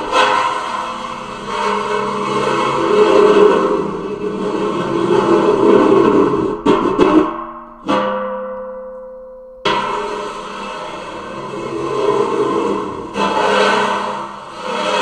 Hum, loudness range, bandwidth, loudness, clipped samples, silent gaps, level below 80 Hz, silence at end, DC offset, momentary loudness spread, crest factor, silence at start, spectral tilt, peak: none; 8 LU; 10 kHz; -16 LUFS; under 0.1%; none; -46 dBFS; 0 s; under 0.1%; 16 LU; 16 dB; 0 s; -5 dB/octave; 0 dBFS